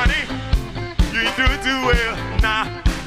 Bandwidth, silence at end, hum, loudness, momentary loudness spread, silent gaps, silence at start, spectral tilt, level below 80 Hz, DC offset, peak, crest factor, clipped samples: 15.5 kHz; 0 s; none; -20 LUFS; 6 LU; none; 0 s; -4.5 dB/octave; -22 dBFS; under 0.1%; -4 dBFS; 16 dB; under 0.1%